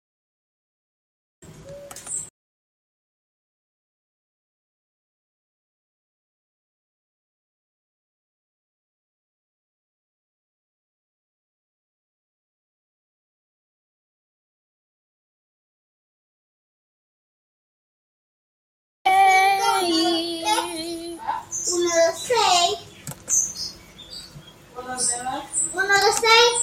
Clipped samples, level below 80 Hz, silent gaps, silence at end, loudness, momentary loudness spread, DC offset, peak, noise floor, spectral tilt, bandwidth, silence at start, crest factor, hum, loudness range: under 0.1%; -62 dBFS; 2.30-19.05 s; 0 s; -20 LUFS; 22 LU; under 0.1%; -4 dBFS; -45 dBFS; -0.5 dB/octave; 16 kHz; 1.45 s; 24 dB; none; 18 LU